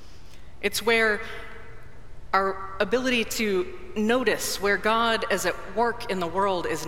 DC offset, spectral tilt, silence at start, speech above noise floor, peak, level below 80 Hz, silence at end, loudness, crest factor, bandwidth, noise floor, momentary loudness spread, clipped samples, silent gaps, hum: 1%; -3 dB/octave; 0 s; 21 dB; -6 dBFS; -48 dBFS; 0 s; -25 LUFS; 20 dB; 16.5 kHz; -46 dBFS; 9 LU; under 0.1%; none; none